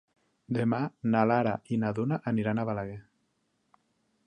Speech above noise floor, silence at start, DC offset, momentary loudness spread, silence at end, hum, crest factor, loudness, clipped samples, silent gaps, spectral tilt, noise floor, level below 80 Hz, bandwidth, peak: 47 dB; 0.5 s; under 0.1%; 10 LU; 1.25 s; none; 20 dB; -29 LUFS; under 0.1%; none; -9 dB/octave; -75 dBFS; -64 dBFS; 9.2 kHz; -10 dBFS